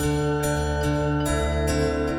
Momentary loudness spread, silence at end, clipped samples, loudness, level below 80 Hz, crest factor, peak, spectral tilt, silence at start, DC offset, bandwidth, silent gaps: 1 LU; 0 s; under 0.1%; -24 LUFS; -30 dBFS; 12 dB; -12 dBFS; -5.5 dB/octave; 0 s; under 0.1%; 17 kHz; none